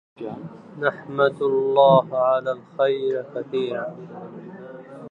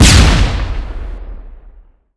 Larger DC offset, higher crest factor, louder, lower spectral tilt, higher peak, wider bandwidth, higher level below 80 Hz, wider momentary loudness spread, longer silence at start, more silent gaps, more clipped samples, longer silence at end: neither; first, 20 dB vs 12 dB; second, -21 LUFS vs -12 LUFS; first, -8 dB/octave vs -4 dB/octave; second, -4 dBFS vs 0 dBFS; second, 4.3 kHz vs 11 kHz; second, -74 dBFS vs -16 dBFS; about the same, 23 LU vs 23 LU; first, 0.2 s vs 0 s; neither; neither; second, 0 s vs 0.45 s